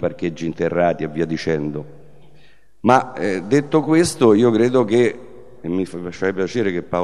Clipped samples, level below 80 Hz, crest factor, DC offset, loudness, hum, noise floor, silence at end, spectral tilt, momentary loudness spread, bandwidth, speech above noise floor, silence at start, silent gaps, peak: under 0.1%; -54 dBFS; 18 dB; 0.9%; -19 LUFS; none; -52 dBFS; 0 s; -6 dB/octave; 11 LU; 12.5 kHz; 34 dB; 0 s; none; 0 dBFS